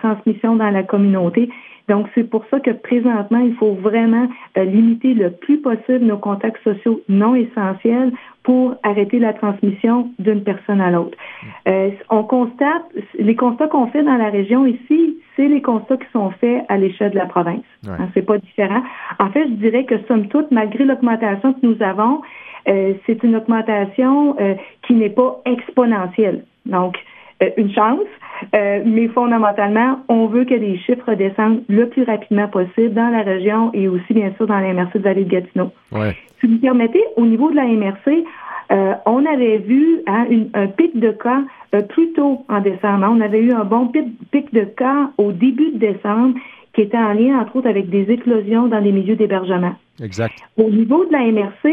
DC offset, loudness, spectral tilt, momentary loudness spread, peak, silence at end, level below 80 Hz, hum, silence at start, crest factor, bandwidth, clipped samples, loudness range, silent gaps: under 0.1%; -16 LUFS; -9 dB/octave; 6 LU; 0 dBFS; 0 s; -60 dBFS; none; 0.05 s; 16 dB; 3.8 kHz; under 0.1%; 2 LU; none